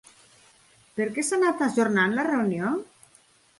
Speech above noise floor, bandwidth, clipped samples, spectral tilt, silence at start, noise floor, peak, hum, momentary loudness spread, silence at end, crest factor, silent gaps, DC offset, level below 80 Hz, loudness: 35 dB; 11.5 kHz; under 0.1%; -5 dB/octave; 0.95 s; -59 dBFS; -10 dBFS; none; 8 LU; 0.75 s; 16 dB; none; under 0.1%; -70 dBFS; -25 LUFS